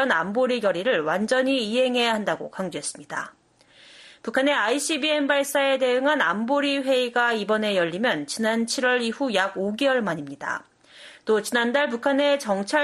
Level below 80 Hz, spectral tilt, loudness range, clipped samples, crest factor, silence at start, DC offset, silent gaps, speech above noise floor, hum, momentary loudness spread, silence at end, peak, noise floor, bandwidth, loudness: -72 dBFS; -3.5 dB/octave; 4 LU; under 0.1%; 16 dB; 0 s; under 0.1%; none; 31 dB; none; 9 LU; 0 s; -8 dBFS; -54 dBFS; 12.5 kHz; -23 LUFS